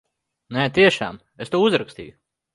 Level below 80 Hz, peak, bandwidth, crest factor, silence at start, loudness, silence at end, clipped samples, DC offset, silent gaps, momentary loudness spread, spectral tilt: -56 dBFS; -2 dBFS; 11.5 kHz; 20 dB; 0.5 s; -20 LUFS; 0.45 s; under 0.1%; under 0.1%; none; 20 LU; -5.5 dB/octave